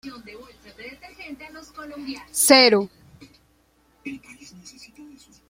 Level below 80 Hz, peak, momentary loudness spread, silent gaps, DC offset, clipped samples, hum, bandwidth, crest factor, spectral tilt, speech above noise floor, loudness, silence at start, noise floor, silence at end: -62 dBFS; 0 dBFS; 29 LU; none; under 0.1%; under 0.1%; none; 16.5 kHz; 24 dB; -1.5 dB/octave; 39 dB; -16 LUFS; 0.05 s; -62 dBFS; 1.3 s